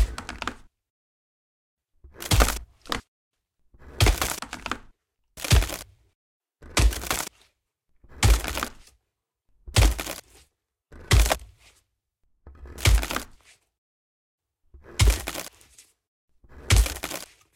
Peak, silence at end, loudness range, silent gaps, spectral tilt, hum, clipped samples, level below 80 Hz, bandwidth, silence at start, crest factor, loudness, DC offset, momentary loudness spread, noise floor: -2 dBFS; 0.3 s; 4 LU; 0.90-1.77 s, 3.08-3.31 s, 6.15-6.40 s, 13.78-14.38 s, 16.08-16.28 s; -3.5 dB/octave; none; under 0.1%; -30 dBFS; 17 kHz; 0 s; 24 dB; -26 LUFS; under 0.1%; 14 LU; -81 dBFS